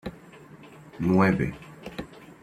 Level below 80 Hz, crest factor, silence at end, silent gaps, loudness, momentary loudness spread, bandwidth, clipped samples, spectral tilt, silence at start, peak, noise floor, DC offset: -52 dBFS; 20 dB; 0.1 s; none; -24 LUFS; 26 LU; 10.5 kHz; under 0.1%; -8 dB/octave; 0.05 s; -8 dBFS; -48 dBFS; under 0.1%